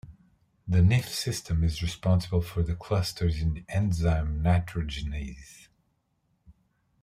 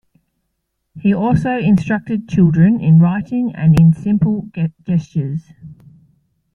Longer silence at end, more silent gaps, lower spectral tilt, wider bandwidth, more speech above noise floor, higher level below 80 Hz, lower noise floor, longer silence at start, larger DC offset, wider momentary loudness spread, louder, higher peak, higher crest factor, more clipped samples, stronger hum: second, 0.5 s vs 0.8 s; neither; second, -6 dB/octave vs -9.5 dB/octave; first, 15.5 kHz vs 6.6 kHz; second, 47 dB vs 58 dB; about the same, -40 dBFS vs -44 dBFS; about the same, -73 dBFS vs -72 dBFS; second, 0.05 s vs 0.95 s; neither; about the same, 10 LU vs 11 LU; second, -28 LUFS vs -15 LUFS; second, -12 dBFS vs -2 dBFS; about the same, 16 dB vs 14 dB; neither; neither